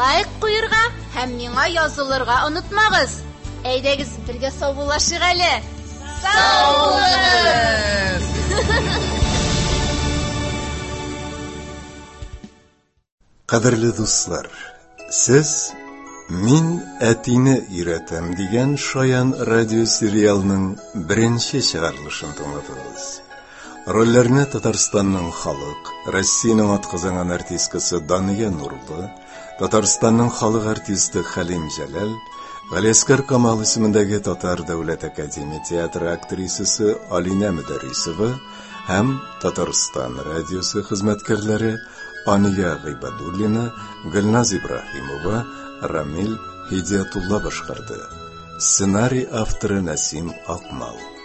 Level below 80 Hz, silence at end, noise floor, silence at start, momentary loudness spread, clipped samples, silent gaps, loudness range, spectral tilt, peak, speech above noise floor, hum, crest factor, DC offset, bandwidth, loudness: -36 dBFS; 0 s; -59 dBFS; 0 s; 16 LU; under 0.1%; 13.12-13.18 s; 6 LU; -4 dB/octave; 0 dBFS; 40 dB; none; 18 dB; under 0.1%; 8.6 kHz; -19 LUFS